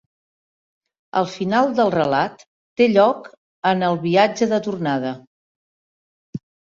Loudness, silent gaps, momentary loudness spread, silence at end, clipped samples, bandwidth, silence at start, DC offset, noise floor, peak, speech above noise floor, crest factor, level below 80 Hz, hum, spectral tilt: -19 LUFS; 2.47-2.76 s, 3.38-3.62 s, 5.27-6.33 s; 19 LU; 0.35 s; under 0.1%; 7.6 kHz; 1.15 s; under 0.1%; under -90 dBFS; -2 dBFS; over 72 dB; 20 dB; -62 dBFS; none; -6 dB/octave